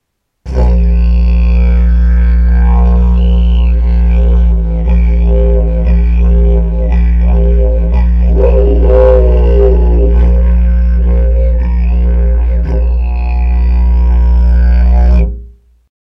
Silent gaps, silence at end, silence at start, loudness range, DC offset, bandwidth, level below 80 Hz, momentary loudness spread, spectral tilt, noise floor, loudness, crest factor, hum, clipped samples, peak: none; 0.5 s; 0.45 s; 3 LU; under 0.1%; 3.2 kHz; -8 dBFS; 4 LU; -10.5 dB/octave; -34 dBFS; -10 LUFS; 8 dB; none; under 0.1%; 0 dBFS